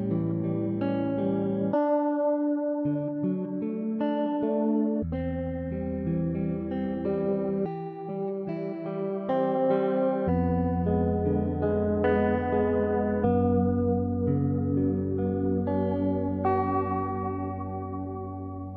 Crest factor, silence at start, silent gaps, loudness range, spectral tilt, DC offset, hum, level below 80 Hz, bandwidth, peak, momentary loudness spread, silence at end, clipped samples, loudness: 14 dB; 0 s; none; 4 LU; -12 dB/octave; under 0.1%; none; -52 dBFS; 4.5 kHz; -12 dBFS; 8 LU; 0 s; under 0.1%; -28 LUFS